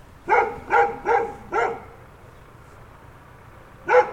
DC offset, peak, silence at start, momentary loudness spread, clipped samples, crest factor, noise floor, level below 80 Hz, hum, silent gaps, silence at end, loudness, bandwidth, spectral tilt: under 0.1%; -4 dBFS; 0.25 s; 15 LU; under 0.1%; 20 dB; -46 dBFS; -52 dBFS; none; none; 0 s; -22 LUFS; 9.6 kHz; -5 dB/octave